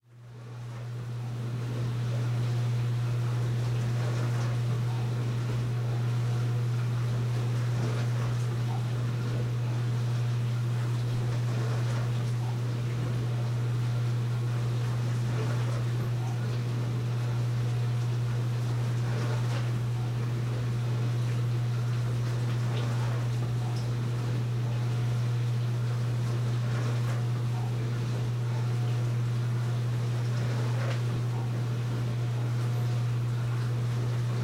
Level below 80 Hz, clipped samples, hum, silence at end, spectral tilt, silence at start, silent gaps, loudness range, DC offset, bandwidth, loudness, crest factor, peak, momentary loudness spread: -54 dBFS; under 0.1%; none; 0 s; -7 dB/octave; 0.1 s; none; 1 LU; under 0.1%; 10.5 kHz; -30 LUFS; 10 dB; -18 dBFS; 2 LU